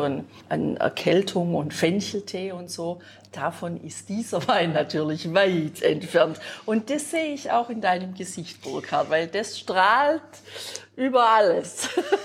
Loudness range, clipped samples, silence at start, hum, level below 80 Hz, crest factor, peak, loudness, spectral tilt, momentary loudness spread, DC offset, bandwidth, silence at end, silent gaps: 5 LU; under 0.1%; 0 s; none; -70 dBFS; 18 dB; -6 dBFS; -24 LUFS; -4.5 dB/octave; 14 LU; under 0.1%; 16 kHz; 0 s; none